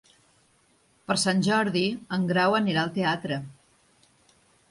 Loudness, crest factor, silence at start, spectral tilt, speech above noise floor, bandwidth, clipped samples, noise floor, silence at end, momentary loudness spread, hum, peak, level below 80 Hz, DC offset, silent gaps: -25 LUFS; 18 dB; 1.1 s; -4.5 dB/octave; 39 dB; 11.5 kHz; under 0.1%; -64 dBFS; 1.2 s; 11 LU; none; -10 dBFS; -66 dBFS; under 0.1%; none